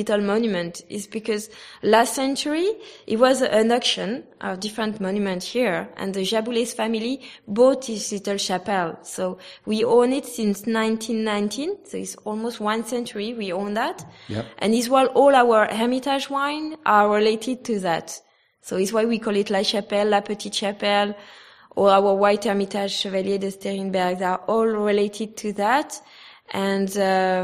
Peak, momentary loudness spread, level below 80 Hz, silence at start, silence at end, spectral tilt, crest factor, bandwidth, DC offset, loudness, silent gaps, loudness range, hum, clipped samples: -2 dBFS; 12 LU; -66 dBFS; 0 s; 0 s; -4 dB/octave; 20 dB; 15 kHz; under 0.1%; -22 LUFS; none; 5 LU; none; under 0.1%